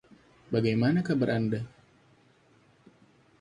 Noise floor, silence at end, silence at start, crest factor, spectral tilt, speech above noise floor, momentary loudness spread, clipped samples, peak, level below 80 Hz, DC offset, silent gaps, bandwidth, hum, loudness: -62 dBFS; 1.75 s; 0.5 s; 18 dB; -8 dB/octave; 36 dB; 9 LU; under 0.1%; -14 dBFS; -62 dBFS; under 0.1%; none; 10.5 kHz; none; -28 LUFS